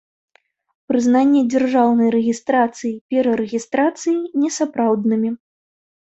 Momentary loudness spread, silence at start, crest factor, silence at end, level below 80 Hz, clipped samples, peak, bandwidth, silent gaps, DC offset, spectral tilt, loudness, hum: 7 LU; 0.9 s; 16 dB; 0.75 s; -64 dBFS; under 0.1%; -4 dBFS; 8.2 kHz; 3.01-3.09 s; under 0.1%; -5.5 dB/octave; -18 LUFS; none